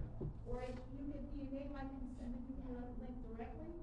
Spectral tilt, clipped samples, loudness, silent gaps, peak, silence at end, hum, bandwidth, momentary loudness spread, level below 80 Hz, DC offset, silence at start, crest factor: -9 dB/octave; under 0.1%; -49 LUFS; none; -30 dBFS; 0 s; none; 9.4 kHz; 3 LU; -50 dBFS; under 0.1%; 0 s; 16 dB